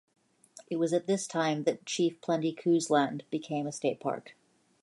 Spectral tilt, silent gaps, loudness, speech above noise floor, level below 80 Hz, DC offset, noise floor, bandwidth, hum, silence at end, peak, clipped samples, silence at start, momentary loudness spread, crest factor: -5 dB/octave; none; -31 LUFS; 27 dB; -82 dBFS; under 0.1%; -57 dBFS; 11.5 kHz; none; 0.5 s; -12 dBFS; under 0.1%; 0.55 s; 8 LU; 18 dB